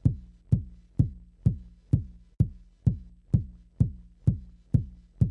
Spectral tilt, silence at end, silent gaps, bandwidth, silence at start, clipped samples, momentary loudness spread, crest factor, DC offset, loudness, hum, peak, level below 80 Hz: -11.5 dB/octave; 0 s; none; 2 kHz; 0.05 s; under 0.1%; 11 LU; 20 dB; under 0.1%; -30 LUFS; none; -8 dBFS; -40 dBFS